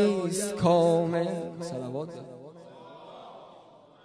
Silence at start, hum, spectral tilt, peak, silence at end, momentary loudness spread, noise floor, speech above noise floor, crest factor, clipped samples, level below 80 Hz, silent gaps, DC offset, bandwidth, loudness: 0 s; none; -6 dB/octave; -10 dBFS; 0.5 s; 25 LU; -54 dBFS; 27 dB; 20 dB; under 0.1%; -66 dBFS; none; under 0.1%; 11 kHz; -27 LUFS